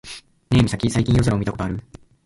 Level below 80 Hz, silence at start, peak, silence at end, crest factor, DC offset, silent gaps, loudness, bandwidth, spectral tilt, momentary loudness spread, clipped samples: -36 dBFS; 0.05 s; -4 dBFS; 0.45 s; 16 dB; under 0.1%; none; -20 LUFS; 11.5 kHz; -6.5 dB/octave; 16 LU; under 0.1%